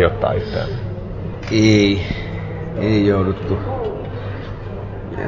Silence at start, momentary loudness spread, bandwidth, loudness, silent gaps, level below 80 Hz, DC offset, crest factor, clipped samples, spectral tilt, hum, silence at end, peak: 0 s; 15 LU; 7.4 kHz; -20 LUFS; none; -32 dBFS; under 0.1%; 18 dB; under 0.1%; -6.5 dB/octave; none; 0 s; -2 dBFS